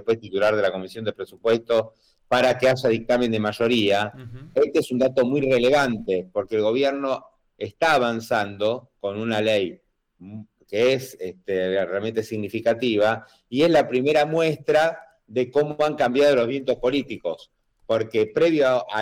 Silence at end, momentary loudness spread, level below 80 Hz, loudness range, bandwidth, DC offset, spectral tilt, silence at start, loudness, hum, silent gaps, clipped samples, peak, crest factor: 0 s; 12 LU; -58 dBFS; 4 LU; 16.5 kHz; under 0.1%; -5.5 dB/octave; 0.05 s; -22 LUFS; none; none; under 0.1%; -12 dBFS; 12 dB